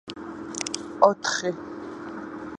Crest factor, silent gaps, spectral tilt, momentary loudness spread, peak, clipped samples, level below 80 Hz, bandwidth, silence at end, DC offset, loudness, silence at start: 26 dB; none; -3 dB/octave; 17 LU; -2 dBFS; under 0.1%; -62 dBFS; 11.5 kHz; 0 s; under 0.1%; -26 LUFS; 0.05 s